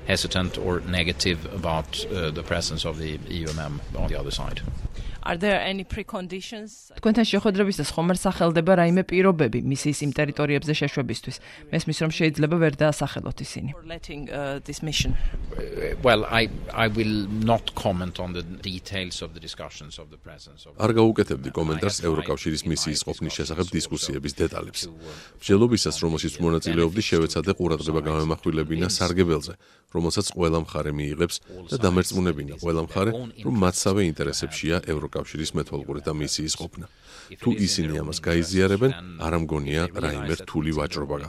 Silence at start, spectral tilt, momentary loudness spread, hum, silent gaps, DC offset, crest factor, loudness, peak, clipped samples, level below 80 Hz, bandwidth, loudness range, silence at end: 0 s; -5 dB/octave; 13 LU; none; none; under 0.1%; 22 dB; -25 LUFS; -2 dBFS; under 0.1%; -38 dBFS; 14.5 kHz; 6 LU; 0 s